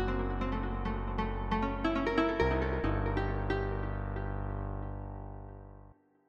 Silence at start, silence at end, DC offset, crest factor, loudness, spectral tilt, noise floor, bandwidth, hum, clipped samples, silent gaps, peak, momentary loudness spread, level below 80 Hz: 0 s; 0.35 s; under 0.1%; 18 dB; -34 LUFS; -8 dB/octave; -58 dBFS; 7 kHz; 50 Hz at -50 dBFS; under 0.1%; none; -14 dBFS; 14 LU; -38 dBFS